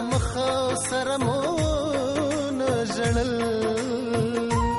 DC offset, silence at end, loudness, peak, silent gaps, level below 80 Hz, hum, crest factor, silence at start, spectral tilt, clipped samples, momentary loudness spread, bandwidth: under 0.1%; 0 s; -25 LUFS; -12 dBFS; none; -38 dBFS; none; 12 dB; 0 s; -5 dB/octave; under 0.1%; 1 LU; 11.5 kHz